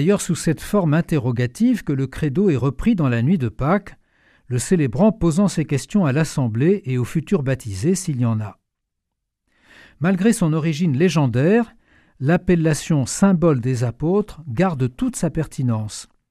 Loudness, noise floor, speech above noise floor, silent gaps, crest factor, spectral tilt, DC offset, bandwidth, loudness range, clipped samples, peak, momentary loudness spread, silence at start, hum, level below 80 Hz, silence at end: -20 LUFS; -78 dBFS; 60 dB; none; 18 dB; -6.5 dB/octave; under 0.1%; 14.5 kHz; 4 LU; under 0.1%; -2 dBFS; 6 LU; 0 s; none; -42 dBFS; 0.25 s